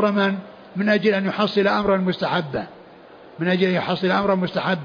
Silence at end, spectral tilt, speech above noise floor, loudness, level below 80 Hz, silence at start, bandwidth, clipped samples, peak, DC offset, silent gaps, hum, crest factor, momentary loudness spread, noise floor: 0 s; -7.5 dB/octave; 24 dB; -21 LUFS; -56 dBFS; 0 s; 5.2 kHz; under 0.1%; -8 dBFS; under 0.1%; none; none; 14 dB; 10 LU; -45 dBFS